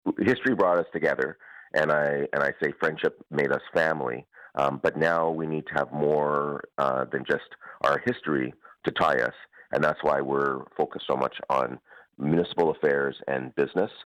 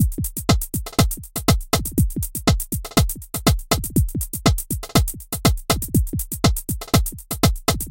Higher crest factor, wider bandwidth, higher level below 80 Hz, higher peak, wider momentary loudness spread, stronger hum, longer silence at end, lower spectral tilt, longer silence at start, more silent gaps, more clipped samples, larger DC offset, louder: about the same, 14 dB vs 18 dB; second, 12 kHz vs 17.5 kHz; second, -62 dBFS vs -26 dBFS; second, -12 dBFS vs -2 dBFS; first, 8 LU vs 5 LU; neither; about the same, 0.05 s vs 0 s; first, -6.5 dB/octave vs -4.5 dB/octave; about the same, 0.05 s vs 0 s; neither; neither; neither; second, -26 LUFS vs -21 LUFS